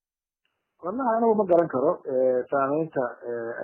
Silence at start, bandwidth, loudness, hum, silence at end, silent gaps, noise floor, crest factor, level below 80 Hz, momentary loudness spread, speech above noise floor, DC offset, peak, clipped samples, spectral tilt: 0.85 s; 3.3 kHz; -25 LUFS; none; 0 s; none; -81 dBFS; 16 dB; -72 dBFS; 11 LU; 57 dB; under 0.1%; -8 dBFS; under 0.1%; -11 dB/octave